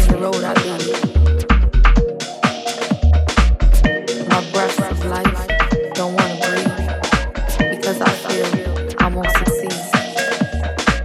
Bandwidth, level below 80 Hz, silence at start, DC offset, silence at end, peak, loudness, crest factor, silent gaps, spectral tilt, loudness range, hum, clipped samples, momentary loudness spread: 14.5 kHz; -18 dBFS; 0 s; under 0.1%; 0 s; 0 dBFS; -18 LUFS; 16 dB; none; -5 dB/octave; 2 LU; none; under 0.1%; 6 LU